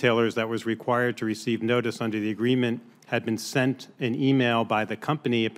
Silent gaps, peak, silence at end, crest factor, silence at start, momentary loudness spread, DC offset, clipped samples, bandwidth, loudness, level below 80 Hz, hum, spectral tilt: none; -8 dBFS; 0 s; 18 dB; 0 s; 7 LU; under 0.1%; under 0.1%; 16 kHz; -26 LUFS; -72 dBFS; none; -6 dB/octave